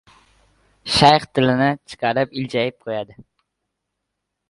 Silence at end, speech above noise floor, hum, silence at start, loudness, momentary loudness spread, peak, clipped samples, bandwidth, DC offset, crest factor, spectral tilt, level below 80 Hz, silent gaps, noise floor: 1.45 s; 60 dB; none; 0.85 s; -19 LUFS; 15 LU; 0 dBFS; under 0.1%; 11.5 kHz; under 0.1%; 22 dB; -5 dB/octave; -50 dBFS; none; -79 dBFS